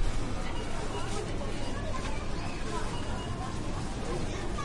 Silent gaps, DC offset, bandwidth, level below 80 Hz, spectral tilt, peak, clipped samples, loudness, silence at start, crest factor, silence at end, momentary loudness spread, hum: none; under 0.1%; 11.5 kHz; -36 dBFS; -5 dB/octave; -18 dBFS; under 0.1%; -36 LUFS; 0 s; 14 dB; 0 s; 1 LU; none